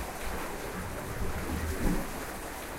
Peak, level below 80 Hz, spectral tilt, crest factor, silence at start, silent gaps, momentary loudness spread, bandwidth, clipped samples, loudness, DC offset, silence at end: -16 dBFS; -38 dBFS; -5 dB/octave; 18 dB; 0 s; none; 6 LU; 16 kHz; under 0.1%; -36 LUFS; under 0.1%; 0 s